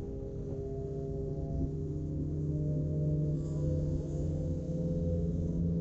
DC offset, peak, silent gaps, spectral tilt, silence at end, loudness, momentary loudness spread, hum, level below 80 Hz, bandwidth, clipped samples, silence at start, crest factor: under 0.1%; -22 dBFS; none; -11 dB/octave; 0 s; -35 LUFS; 6 LU; none; -42 dBFS; 7.6 kHz; under 0.1%; 0 s; 12 dB